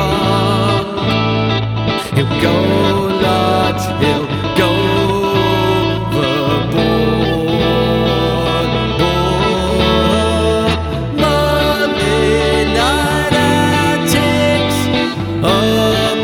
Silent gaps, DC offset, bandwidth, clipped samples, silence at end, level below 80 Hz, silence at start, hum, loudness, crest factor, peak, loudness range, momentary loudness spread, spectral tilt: none; under 0.1%; 18.5 kHz; under 0.1%; 0 s; -28 dBFS; 0 s; none; -14 LUFS; 12 dB; -2 dBFS; 1 LU; 3 LU; -5.5 dB/octave